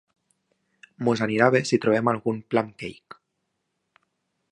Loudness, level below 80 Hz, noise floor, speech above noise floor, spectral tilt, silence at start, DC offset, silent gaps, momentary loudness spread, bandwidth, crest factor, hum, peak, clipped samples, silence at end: -23 LUFS; -66 dBFS; -78 dBFS; 55 dB; -6 dB/octave; 1 s; under 0.1%; none; 13 LU; 10.5 kHz; 24 dB; none; -2 dBFS; under 0.1%; 1.4 s